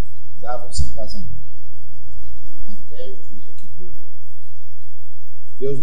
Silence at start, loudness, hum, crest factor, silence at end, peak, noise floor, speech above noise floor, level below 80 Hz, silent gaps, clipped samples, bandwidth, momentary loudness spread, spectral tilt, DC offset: 0 s; -34 LUFS; 60 Hz at -50 dBFS; 16 dB; 0 s; 0 dBFS; -45 dBFS; 23 dB; -38 dBFS; none; under 0.1%; over 20 kHz; 19 LU; -6 dB/octave; 40%